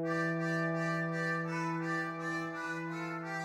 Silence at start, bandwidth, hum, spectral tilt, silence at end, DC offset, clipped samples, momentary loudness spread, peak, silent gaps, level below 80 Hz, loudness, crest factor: 0 s; 11.5 kHz; none; -6.5 dB/octave; 0 s; under 0.1%; under 0.1%; 5 LU; -22 dBFS; none; -78 dBFS; -35 LUFS; 14 dB